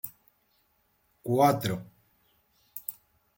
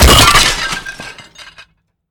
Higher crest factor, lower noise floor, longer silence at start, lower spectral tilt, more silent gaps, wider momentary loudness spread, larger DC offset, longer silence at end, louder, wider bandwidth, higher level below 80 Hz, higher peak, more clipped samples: first, 24 dB vs 12 dB; first, -71 dBFS vs -47 dBFS; about the same, 0.05 s vs 0 s; first, -6 dB/octave vs -2.5 dB/octave; neither; second, 18 LU vs 24 LU; neither; second, 0.45 s vs 0.65 s; second, -29 LUFS vs -9 LUFS; second, 17 kHz vs 19.5 kHz; second, -68 dBFS vs -18 dBFS; second, -8 dBFS vs 0 dBFS; second, under 0.1% vs 0.1%